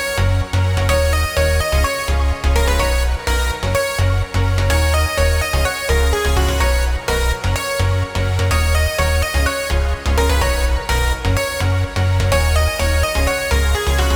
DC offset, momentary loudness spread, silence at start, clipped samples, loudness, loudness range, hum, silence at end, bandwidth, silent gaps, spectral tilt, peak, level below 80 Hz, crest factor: under 0.1%; 3 LU; 0 s; under 0.1%; -17 LUFS; 1 LU; none; 0 s; over 20 kHz; none; -4.5 dB/octave; -2 dBFS; -20 dBFS; 14 dB